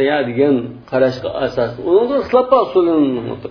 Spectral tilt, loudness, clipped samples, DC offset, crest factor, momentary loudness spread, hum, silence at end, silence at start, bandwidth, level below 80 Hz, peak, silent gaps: -8 dB/octave; -16 LUFS; under 0.1%; under 0.1%; 16 dB; 7 LU; none; 0 s; 0 s; 5.4 kHz; -48 dBFS; 0 dBFS; none